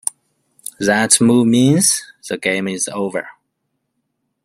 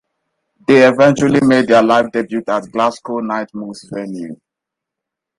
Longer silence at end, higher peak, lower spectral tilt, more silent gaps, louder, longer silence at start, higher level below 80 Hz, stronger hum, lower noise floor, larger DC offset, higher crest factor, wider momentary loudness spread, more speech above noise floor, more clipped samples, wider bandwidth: about the same, 1.15 s vs 1.05 s; about the same, 0 dBFS vs 0 dBFS; second, -3.5 dB/octave vs -6 dB/octave; neither; about the same, -15 LUFS vs -13 LUFS; about the same, 0.8 s vs 0.7 s; about the same, -58 dBFS vs -54 dBFS; neither; second, -72 dBFS vs -82 dBFS; neither; about the same, 18 dB vs 14 dB; about the same, 16 LU vs 17 LU; second, 57 dB vs 69 dB; neither; first, 16 kHz vs 11.5 kHz